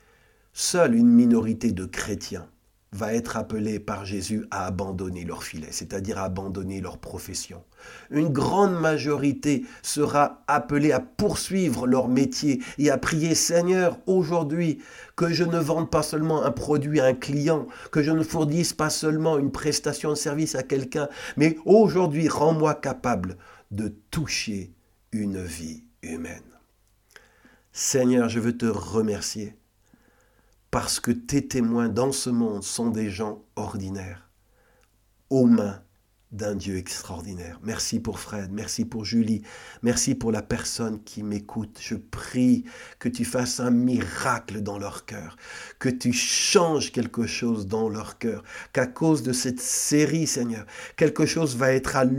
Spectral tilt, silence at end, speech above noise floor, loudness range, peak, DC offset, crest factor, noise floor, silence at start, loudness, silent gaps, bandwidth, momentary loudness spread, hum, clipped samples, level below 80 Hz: -4.5 dB/octave; 0 s; 39 dB; 7 LU; -4 dBFS; under 0.1%; 20 dB; -64 dBFS; 0.55 s; -25 LUFS; none; 17 kHz; 14 LU; none; under 0.1%; -52 dBFS